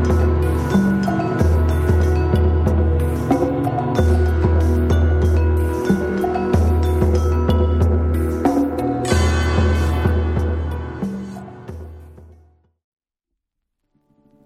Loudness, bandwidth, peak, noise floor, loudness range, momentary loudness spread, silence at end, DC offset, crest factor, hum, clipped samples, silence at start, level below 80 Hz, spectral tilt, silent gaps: -18 LUFS; 13.5 kHz; -2 dBFS; -80 dBFS; 8 LU; 9 LU; 2.2 s; under 0.1%; 14 dB; none; under 0.1%; 0 s; -22 dBFS; -7.5 dB/octave; none